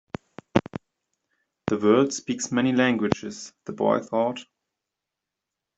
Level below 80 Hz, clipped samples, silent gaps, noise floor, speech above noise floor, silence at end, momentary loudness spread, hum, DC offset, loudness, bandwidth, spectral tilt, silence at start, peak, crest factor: -62 dBFS; under 0.1%; none; -86 dBFS; 62 dB; 1.35 s; 18 LU; none; under 0.1%; -24 LUFS; 8.2 kHz; -5 dB/octave; 0.55 s; -2 dBFS; 24 dB